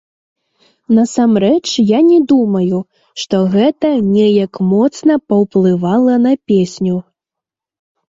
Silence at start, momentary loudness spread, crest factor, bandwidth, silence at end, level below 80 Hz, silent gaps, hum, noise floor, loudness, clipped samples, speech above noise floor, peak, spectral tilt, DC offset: 0.9 s; 7 LU; 12 dB; 7.8 kHz; 1.1 s; -54 dBFS; none; none; -84 dBFS; -13 LUFS; under 0.1%; 72 dB; -2 dBFS; -7 dB/octave; under 0.1%